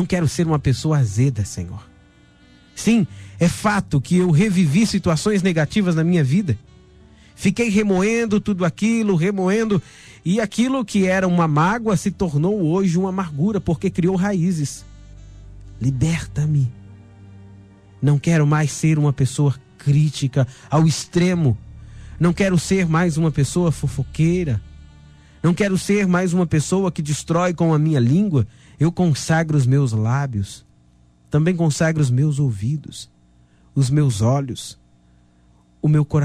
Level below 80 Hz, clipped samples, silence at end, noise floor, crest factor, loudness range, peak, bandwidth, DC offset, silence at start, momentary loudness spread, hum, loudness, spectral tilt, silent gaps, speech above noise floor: -44 dBFS; under 0.1%; 0 s; -54 dBFS; 12 dB; 4 LU; -6 dBFS; 13.5 kHz; under 0.1%; 0 s; 8 LU; 60 Hz at -45 dBFS; -19 LUFS; -6.5 dB/octave; none; 36 dB